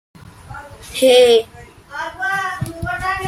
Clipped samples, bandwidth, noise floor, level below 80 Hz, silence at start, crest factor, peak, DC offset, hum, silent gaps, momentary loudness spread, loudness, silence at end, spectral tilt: under 0.1%; 15 kHz; -36 dBFS; -44 dBFS; 0.25 s; 16 dB; 0 dBFS; under 0.1%; none; none; 24 LU; -15 LUFS; 0 s; -3.5 dB/octave